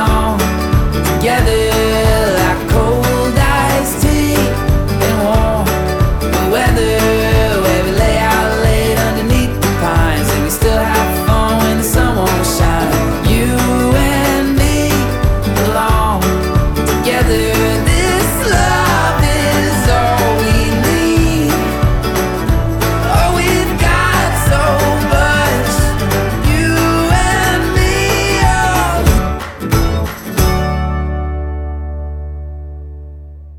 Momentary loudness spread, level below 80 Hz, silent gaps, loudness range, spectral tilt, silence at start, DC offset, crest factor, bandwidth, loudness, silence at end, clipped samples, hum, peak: 4 LU; -18 dBFS; none; 1 LU; -5 dB/octave; 0 s; under 0.1%; 12 dB; 19 kHz; -13 LUFS; 0 s; under 0.1%; none; 0 dBFS